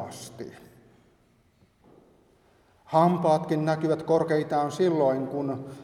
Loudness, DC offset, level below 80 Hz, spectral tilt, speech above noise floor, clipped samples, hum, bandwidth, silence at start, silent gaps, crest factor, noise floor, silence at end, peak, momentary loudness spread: -25 LUFS; under 0.1%; -68 dBFS; -7 dB/octave; 39 dB; under 0.1%; none; 14.5 kHz; 0 s; none; 20 dB; -63 dBFS; 0 s; -8 dBFS; 17 LU